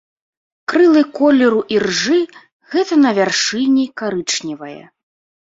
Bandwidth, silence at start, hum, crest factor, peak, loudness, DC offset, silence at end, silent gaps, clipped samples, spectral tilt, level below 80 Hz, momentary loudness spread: 7.8 kHz; 0.7 s; none; 14 dB; -2 dBFS; -15 LUFS; under 0.1%; 0.8 s; 2.52-2.60 s; under 0.1%; -3.5 dB/octave; -60 dBFS; 14 LU